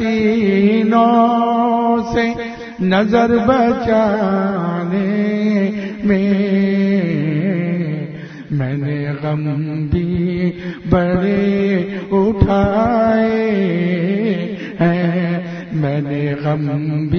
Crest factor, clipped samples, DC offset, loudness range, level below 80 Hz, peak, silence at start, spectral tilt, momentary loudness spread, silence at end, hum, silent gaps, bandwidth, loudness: 16 dB; under 0.1%; under 0.1%; 4 LU; -38 dBFS; 0 dBFS; 0 s; -8.5 dB/octave; 8 LU; 0 s; none; none; 6.4 kHz; -16 LUFS